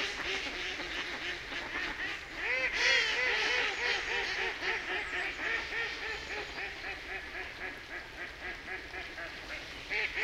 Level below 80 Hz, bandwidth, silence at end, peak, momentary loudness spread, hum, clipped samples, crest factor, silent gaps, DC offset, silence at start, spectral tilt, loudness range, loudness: -56 dBFS; 16 kHz; 0 s; -14 dBFS; 13 LU; none; under 0.1%; 20 dB; none; under 0.1%; 0 s; -1.5 dB/octave; 10 LU; -34 LUFS